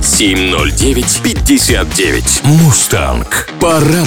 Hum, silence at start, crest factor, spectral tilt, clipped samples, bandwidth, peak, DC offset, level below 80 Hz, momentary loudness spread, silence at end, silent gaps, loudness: none; 0 s; 10 dB; -3.5 dB/octave; under 0.1%; 18 kHz; 0 dBFS; under 0.1%; -20 dBFS; 5 LU; 0 s; none; -10 LUFS